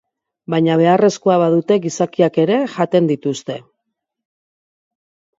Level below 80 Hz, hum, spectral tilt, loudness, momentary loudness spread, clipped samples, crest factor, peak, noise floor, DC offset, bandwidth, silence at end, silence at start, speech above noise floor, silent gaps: -66 dBFS; none; -6.5 dB/octave; -16 LUFS; 10 LU; under 0.1%; 18 dB; 0 dBFS; -77 dBFS; under 0.1%; 7.8 kHz; 1.8 s; 0.5 s; 62 dB; none